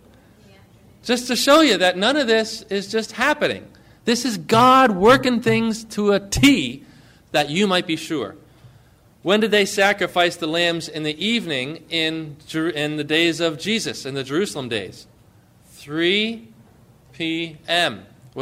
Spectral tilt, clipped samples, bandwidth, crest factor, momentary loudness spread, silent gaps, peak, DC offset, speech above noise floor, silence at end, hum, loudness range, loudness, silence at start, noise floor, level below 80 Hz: -4 dB/octave; under 0.1%; 16 kHz; 16 dB; 14 LU; none; -4 dBFS; under 0.1%; 33 dB; 0 s; none; 7 LU; -19 LUFS; 1.05 s; -52 dBFS; -48 dBFS